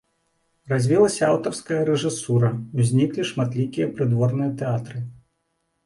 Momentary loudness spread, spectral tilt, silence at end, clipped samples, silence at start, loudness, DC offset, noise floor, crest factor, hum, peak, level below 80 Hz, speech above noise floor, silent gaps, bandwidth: 8 LU; -6.5 dB/octave; 0.7 s; under 0.1%; 0.65 s; -22 LUFS; under 0.1%; -73 dBFS; 18 dB; none; -6 dBFS; -60 dBFS; 52 dB; none; 11.5 kHz